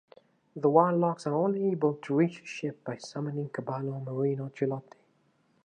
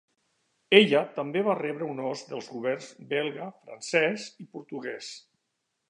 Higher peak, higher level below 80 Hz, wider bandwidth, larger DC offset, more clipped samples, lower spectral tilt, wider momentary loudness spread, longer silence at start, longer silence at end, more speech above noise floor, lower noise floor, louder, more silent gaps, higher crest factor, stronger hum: second, -8 dBFS vs -2 dBFS; about the same, -82 dBFS vs -84 dBFS; about the same, 10 kHz vs 10.5 kHz; neither; neither; first, -8 dB/octave vs -4.5 dB/octave; second, 13 LU vs 20 LU; second, 0.55 s vs 0.7 s; first, 0.85 s vs 0.7 s; second, 40 dB vs 52 dB; second, -69 dBFS vs -80 dBFS; second, -30 LUFS vs -27 LUFS; neither; second, 22 dB vs 28 dB; neither